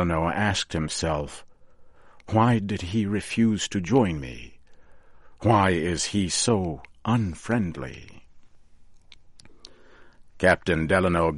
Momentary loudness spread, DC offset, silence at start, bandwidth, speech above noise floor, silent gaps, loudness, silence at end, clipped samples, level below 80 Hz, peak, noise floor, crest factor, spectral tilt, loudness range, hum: 13 LU; under 0.1%; 0 s; 11.5 kHz; 25 dB; none; -24 LUFS; 0 s; under 0.1%; -46 dBFS; -4 dBFS; -49 dBFS; 20 dB; -5 dB/octave; 6 LU; none